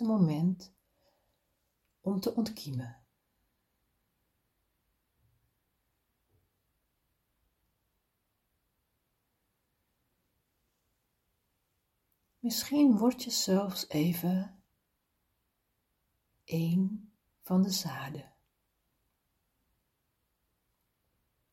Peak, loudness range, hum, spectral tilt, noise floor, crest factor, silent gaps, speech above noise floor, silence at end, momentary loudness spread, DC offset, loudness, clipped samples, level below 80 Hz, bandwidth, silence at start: -16 dBFS; 12 LU; none; -5.5 dB/octave; -80 dBFS; 20 dB; none; 50 dB; 3.3 s; 15 LU; under 0.1%; -31 LUFS; under 0.1%; -74 dBFS; 16.5 kHz; 0 s